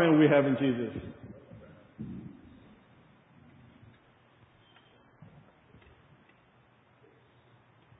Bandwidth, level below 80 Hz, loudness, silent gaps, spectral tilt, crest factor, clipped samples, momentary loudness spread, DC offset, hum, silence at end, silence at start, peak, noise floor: 3.9 kHz; -64 dBFS; -28 LUFS; none; -10.5 dB/octave; 22 dB; under 0.1%; 30 LU; under 0.1%; none; 5.65 s; 0 s; -10 dBFS; -63 dBFS